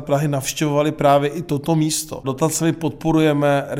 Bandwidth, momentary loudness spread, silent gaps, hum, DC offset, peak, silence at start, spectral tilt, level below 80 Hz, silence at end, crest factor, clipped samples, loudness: 17 kHz; 7 LU; none; none; under 0.1%; -4 dBFS; 0 s; -5.5 dB/octave; -48 dBFS; 0 s; 14 dB; under 0.1%; -19 LUFS